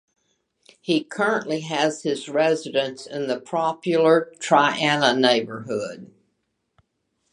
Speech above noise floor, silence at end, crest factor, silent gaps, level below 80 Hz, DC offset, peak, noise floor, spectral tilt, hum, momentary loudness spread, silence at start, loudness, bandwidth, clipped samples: 52 dB; 1.25 s; 22 dB; none; -74 dBFS; under 0.1%; -2 dBFS; -74 dBFS; -4 dB/octave; none; 11 LU; 0.85 s; -22 LUFS; 11 kHz; under 0.1%